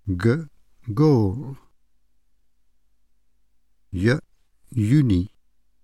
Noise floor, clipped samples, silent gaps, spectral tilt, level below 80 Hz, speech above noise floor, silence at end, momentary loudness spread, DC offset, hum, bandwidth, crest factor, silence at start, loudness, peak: -68 dBFS; under 0.1%; none; -8.5 dB/octave; -48 dBFS; 48 dB; 0.55 s; 17 LU; 0.2%; none; 12 kHz; 16 dB; 0.05 s; -22 LUFS; -8 dBFS